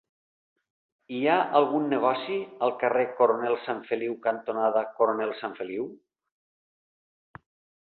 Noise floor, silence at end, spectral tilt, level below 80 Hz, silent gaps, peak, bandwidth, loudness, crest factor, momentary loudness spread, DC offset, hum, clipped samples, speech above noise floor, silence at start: under -90 dBFS; 1.85 s; -9 dB/octave; -76 dBFS; none; -6 dBFS; 4.5 kHz; -27 LUFS; 22 dB; 10 LU; under 0.1%; none; under 0.1%; over 64 dB; 1.1 s